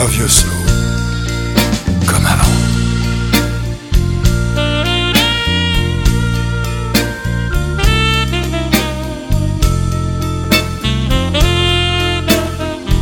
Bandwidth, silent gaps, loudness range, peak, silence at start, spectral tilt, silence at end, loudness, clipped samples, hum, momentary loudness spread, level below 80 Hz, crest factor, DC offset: 17.5 kHz; none; 2 LU; 0 dBFS; 0 s; -4 dB/octave; 0 s; -14 LUFS; under 0.1%; none; 7 LU; -18 dBFS; 14 dB; under 0.1%